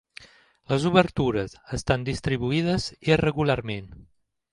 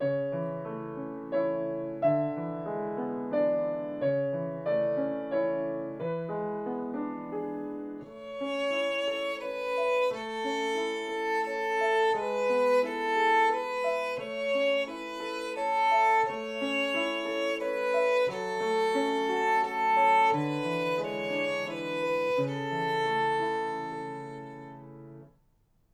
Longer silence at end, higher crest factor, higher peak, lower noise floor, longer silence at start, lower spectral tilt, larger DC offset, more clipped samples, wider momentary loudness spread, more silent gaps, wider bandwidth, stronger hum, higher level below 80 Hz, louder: second, 0.5 s vs 0.65 s; first, 20 dB vs 14 dB; first, -4 dBFS vs -16 dBFS; second, -50 dBFS vs -67 dBFS; first, 0.2 s vs 0 s; about the same, -6 dB/octave vs -5 dB/octave; neither; neither; about the same, 11 LU vs 11 LU; neither; second, 11.5 kHz vs 14.5 kHz; neither; first, -46 dBFS vs -70 dBFS; first, -25 LUFS vs -29 LUFS